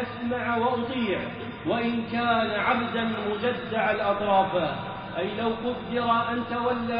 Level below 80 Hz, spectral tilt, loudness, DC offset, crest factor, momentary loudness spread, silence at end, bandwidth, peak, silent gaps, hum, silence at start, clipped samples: -56 dBFS; -3.5 dB/octave; -26 LUFS; under 0.1%; 16 dB; 7 LU; 0 s; 5.2 kHz; -10 dBFS; none; none; 0 s; under 0.1%